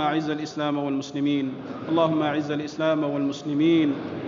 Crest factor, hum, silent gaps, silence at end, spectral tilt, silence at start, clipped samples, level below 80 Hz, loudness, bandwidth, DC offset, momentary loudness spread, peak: 16 dB; none; none; 0 s; -6.5 dB/octave; 0 s; under 0.1%; -70 dBFS; -25 LUFS; 7.4 kHz; under 0.1%; 7 LU; -10 dBFS